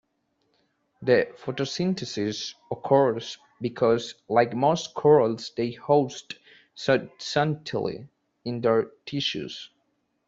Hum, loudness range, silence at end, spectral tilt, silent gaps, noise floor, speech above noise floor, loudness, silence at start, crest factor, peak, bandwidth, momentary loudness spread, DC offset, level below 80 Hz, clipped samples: none; 4 LU; 0.6 s; -5.5 dB/octave; none; -73 dBFS; 48 dB; -25 LUFS; 1 s; 20 dB; -6 dBFS; 7.8 kHz; 14 LU; under 0.1%; -66 dBFS; under 0.1%